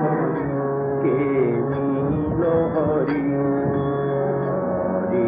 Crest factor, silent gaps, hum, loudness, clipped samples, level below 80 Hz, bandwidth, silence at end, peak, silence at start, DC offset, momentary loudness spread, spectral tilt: 12 dB; none; none; -22 LUFS; under 0.1%; -46 dBFS; 4.9 kHz; 0 s; -10 dBFS; 0 s; under 0.1%; 3 LU; -13 dB/octave